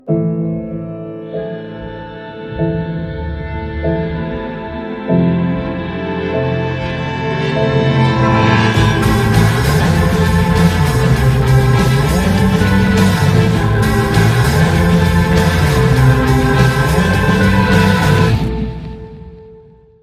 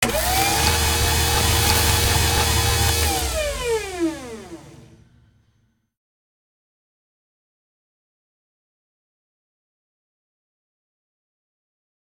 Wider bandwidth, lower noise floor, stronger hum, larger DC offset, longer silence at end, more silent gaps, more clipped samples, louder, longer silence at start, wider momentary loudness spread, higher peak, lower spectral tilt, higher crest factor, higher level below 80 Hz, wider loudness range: second, 15.5 kHz vs 19.5 kHz; second, -41 dBFS vs -65 dBFS; neither; neither; second, 0.45 s vs 7.3 s; neither; neither; first, -13 LUFS vs -19 LUFS; about the same, 0.05 s vs 0 s; first, 13 LU vs 9 LU; about the same, 0 dBFS vs -2 dBFS; first, -6.5 dB/octave vs -3 dB/octave; second, 14 dB vs 22 dB; first, -24 dBFS vs -32 dBFS; second, 9 LU vs 13 LU